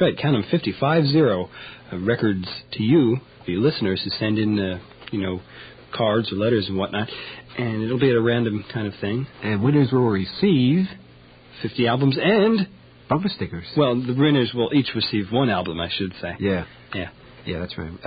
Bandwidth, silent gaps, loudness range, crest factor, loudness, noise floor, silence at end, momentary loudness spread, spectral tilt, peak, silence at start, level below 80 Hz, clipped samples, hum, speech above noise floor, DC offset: 5 kHz; none; 3 LU; 16 dB; -22 LUFS; -48 dBFS; 0 s; 13 LU; -11.5 dB/octave; -6 dBFS; 0 s; -48 dBFS; under 0.1%; none; 27 dB; under 0.1%